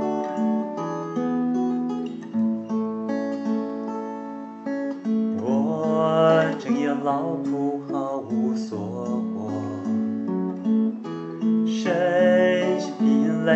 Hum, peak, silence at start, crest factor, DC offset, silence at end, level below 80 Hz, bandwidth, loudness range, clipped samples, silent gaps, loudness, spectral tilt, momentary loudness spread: none; -6 dBFS; 0 s; 18 dB; under 0.1%; 0 s; -80 dBFS; 7.6 kHz; 5 LU; under 0.1%; none; -24 LUFS; -7 dB/octave; 10 LU